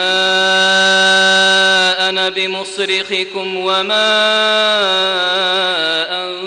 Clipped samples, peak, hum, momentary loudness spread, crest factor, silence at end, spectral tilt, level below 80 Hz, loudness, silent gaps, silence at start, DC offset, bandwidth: under 0.1%; -4 dBFS; none; 9 LU; 10 dB; 0 s; -1.5 dB/octave; -62 dBFS; -12 LUFS; none; 0 s; under 0.1%; 11 kHz